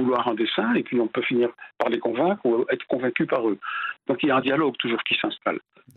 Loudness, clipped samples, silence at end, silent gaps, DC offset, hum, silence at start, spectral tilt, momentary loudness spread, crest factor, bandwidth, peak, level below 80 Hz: -24 LUFS; under 0.1%; 0.4 s; none; under 0.1%; none; 0 s; -7.5 dB/octave; 6 LU; 20 dB; 4.6 kHz; -4 dBFS; -70 dBFS